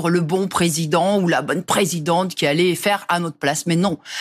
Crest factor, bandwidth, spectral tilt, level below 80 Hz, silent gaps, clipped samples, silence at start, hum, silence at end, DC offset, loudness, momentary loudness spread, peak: 14 dB; 14.5 kHz; -4.5 dB/octave; -58 dBFS; none; under 0.1%; 0 s; none; 0 s; under 0.1%; -19 LUFS; 3 LU; -4 dBFS